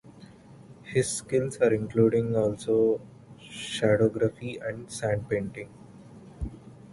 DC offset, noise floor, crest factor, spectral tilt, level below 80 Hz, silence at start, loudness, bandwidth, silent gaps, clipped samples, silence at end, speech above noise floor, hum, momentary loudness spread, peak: under 0.1%; -50 dBFS; 18 dB; -5.5 dB/octave; -50 dBFS; 0.05 s; -27 LUFS; 11.5 kHz; none; under 0.1%; 0 s; 24 dB; none; 16 LU; -10 dBFS